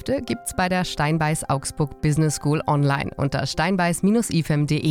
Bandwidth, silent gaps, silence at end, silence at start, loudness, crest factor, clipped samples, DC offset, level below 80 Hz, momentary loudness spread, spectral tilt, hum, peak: 16 kHz; none; 0 s; 0 s; -22 LUFS; 12 dB; under 0.1%; under 0.1%; -44 dBFS; 5 LU; -5.5 dB/octave; none; -10 dBFS